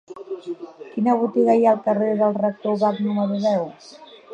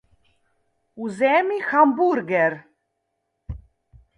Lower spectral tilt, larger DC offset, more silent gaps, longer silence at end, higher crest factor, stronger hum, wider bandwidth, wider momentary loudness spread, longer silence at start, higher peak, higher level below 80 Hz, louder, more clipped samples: about the same, -8 dB/octave vs -7 dB/octave; neither; neither; second, 0 s vs 0.6 s; about the same, 18 dB vs 20 dB; neither; second, 8.2 kHz vs 10.5 kHz; second, 16 LU vs 22 LU; second, 0.1 s vs 0.95 s; about the same, -4 dBFS vs -4 dBFS; second, -74 dBFS vs -50 dBFS; about the same, -20 LUFS vs -20 LUFS; neither